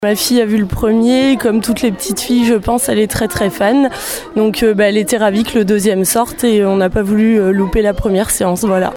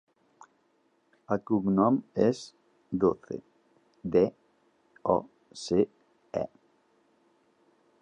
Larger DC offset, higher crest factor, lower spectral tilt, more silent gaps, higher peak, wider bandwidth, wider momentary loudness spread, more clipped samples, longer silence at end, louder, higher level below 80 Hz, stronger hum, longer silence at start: neither; second, 12 dB vs 22 dB; second, -4.5 dB/octave vs -7.5 dB/octave; neither; first, 0 dBFS vs -8 dBFS; first, 19.5 kHz vs 10 kHz; second, 4 LU vs 16 LU; neither; second, 0 s vs 1.55 s; first, -13 LUFS vs -29 LUFS; first, -32 dBFS vs -62 dBFS; neither; second, 0 s vs 1.3 s